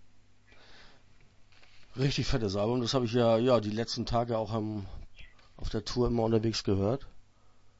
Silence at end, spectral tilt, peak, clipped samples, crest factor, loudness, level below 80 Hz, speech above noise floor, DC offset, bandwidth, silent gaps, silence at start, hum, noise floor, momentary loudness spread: 0.1 s; -6 dB/octave; -14 dBFS; under 0.1%; 18 dB; -30 LUFS; -46 dBFS; 28 dB; under 0.1%; 8 kHz; none; 0 s; none; -57 dBFS; 12 LU